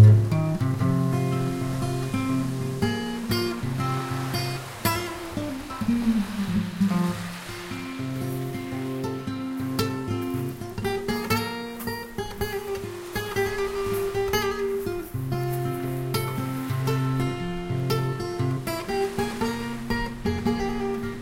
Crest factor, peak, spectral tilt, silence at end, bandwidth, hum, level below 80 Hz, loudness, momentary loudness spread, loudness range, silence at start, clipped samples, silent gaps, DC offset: 20 dB; -4 dBFS; -6.5 dB/octave; 0 s; 16.5 kHz; none; -44 dBFS; -27 LUFS; 7 LU; 3 LU; 0 s; under 0.1%; none; under 0.1%